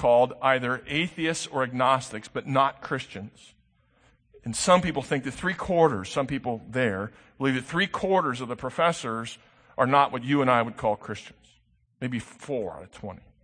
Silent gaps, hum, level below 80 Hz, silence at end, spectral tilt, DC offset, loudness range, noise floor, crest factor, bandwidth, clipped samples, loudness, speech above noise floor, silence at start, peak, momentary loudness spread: none; none; -56 dBFS; 0.25 s; -5 dB/octave; under 0.1%; 3 LU; -65 dBFS; 22 dB; 9.8 kHz; under 0.1%; -26 LUFS; 39 dB; 0 s; -6 dBFS; 17 LU